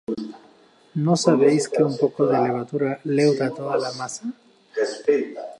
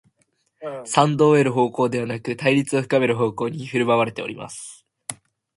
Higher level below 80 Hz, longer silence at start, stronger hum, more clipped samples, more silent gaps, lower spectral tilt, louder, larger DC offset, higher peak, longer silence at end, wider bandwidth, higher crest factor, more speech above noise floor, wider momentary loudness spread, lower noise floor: second, -72 dBFS vs -62 dBFS; second, 0.1 s vs 0.6 s; neither; neither; neither; about the same, -6 dB/octave vs -5.5 dB/octave; about the same, -22 LUFS vs -20 LUFS; neither; second, -4 dBFS vs 0 dBFS; second, 0.05 s vs 0.45 s; about the same, 11.5 kHz vs 11.5 kHz; about the same, 18 dB vs 22 dB; second, 33 dB vs 47 dB; second, 14 LU vs 18 LU; second, -54 dBFS vs -68 dBFS